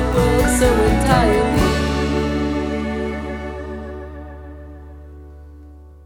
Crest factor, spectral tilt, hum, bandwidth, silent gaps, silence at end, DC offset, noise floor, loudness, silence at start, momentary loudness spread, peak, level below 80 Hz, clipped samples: 20 dB; -5.5 dB/octave; none; 20 kHz; none; 0 s; under 0.1%; -40 dBFS; -18 LUFS; 0 s; 22 LU; 0 dBFS; -26 dBFS; under 0.1%